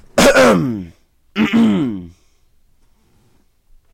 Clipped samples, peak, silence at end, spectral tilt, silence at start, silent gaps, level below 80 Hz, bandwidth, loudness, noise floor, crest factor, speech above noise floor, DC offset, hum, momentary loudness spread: under 0.1%; -4 dBFS; 1.85 s; -4.5 dB/octave; 0.15 s; none; -40 dBFS; 16.5 kHz; -14 LUFS; -55 dBFS; 14 dB; 39 dB; under 0.1%; none; 19 LU